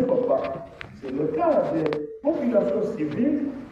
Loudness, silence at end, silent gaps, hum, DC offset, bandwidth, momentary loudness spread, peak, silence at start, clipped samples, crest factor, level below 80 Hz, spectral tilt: -24 LUFS; 0 s; none; none; under 0.1%; 7.8 kHz; 11 LU; -8 dBFS; 0 s; under 0.1%; 16 dB; -58 dBFS; -8.5 dB/octave